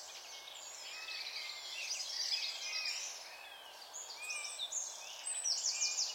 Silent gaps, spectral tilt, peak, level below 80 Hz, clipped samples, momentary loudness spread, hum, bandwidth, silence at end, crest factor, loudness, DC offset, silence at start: none; 4.5 dB/octave; -22 dBFS; -90 dBFS; under 0.1%; 14 LU; none; 16.5 kHz; 0 s; 20 dB; -39 LUFS; under 0.1%; 0 s